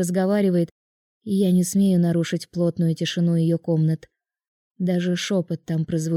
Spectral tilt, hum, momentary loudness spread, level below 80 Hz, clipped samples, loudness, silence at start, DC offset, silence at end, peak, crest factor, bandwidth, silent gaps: -6.5 dB/octave; none; 7 LU; -64 dBFS; under 0.1%; -22 LUFS; 0 s; under 0.1%; 0 s; -10 dBFS; 12 dB; 15 kHz; 0.71-1.21 s, 4.48-4.75 s